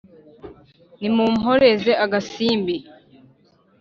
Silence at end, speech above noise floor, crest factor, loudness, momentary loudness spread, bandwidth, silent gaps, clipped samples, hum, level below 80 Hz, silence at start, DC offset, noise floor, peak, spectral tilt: 1 s; 39 dB; 18 dB; -19 LUFS; 11 LU; 7.2 kHz; none; under 0.1%; none; -56 dBFS; 0.45 s; under 0.1%; -57 dBFS; -4 dBFS; -3.5 dB/octave